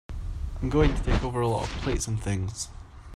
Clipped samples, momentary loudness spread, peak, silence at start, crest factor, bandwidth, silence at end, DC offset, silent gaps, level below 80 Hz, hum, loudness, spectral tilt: under 0.1%; 13 LU; -8 dBFS; 0.1 s; 18 dB; 12.5 kHz; 0 s; under 0.1%; none; -32 dBFS; none; -28 LUFS; -5.5 dB/octave